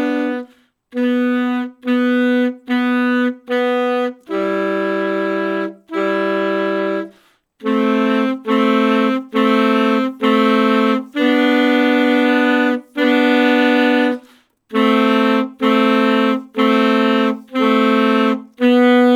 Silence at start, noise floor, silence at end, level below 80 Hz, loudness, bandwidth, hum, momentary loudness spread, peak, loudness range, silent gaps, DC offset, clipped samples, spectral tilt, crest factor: 0 s; -53 dBFS; 0 s; -74 dBFS; -16 LUFS; 13.5 kHz; none; 7 LU; -2 dBFS; 5 LU; none; under 0.1%; under 0.1%; -6 dB/octave; 14 dB